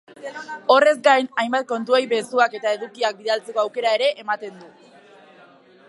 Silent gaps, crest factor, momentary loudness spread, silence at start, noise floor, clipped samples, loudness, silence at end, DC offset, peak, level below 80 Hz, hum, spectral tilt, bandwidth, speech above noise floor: none; 20 dB; 12 LU; 0.2 s; -50 dBFS; under 0.1%; -20 LUFS; 1.2 s; under 0.1%; -2 dBFS; -84 dBFS; none; -2.5 dB/octave; 11.5 kHz; 29 dB